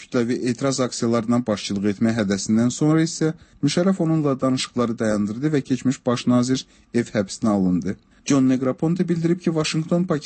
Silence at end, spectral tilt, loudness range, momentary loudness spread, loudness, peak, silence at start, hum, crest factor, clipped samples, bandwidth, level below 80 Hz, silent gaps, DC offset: 0 s; -6 dB/octave; 1 LU; 5 LU; -22 LUFS; -8 dBFS; 0 s; none; 14 dB; under 0.1%; 8.8 kHz; -56 dBFS; none; under 0.1%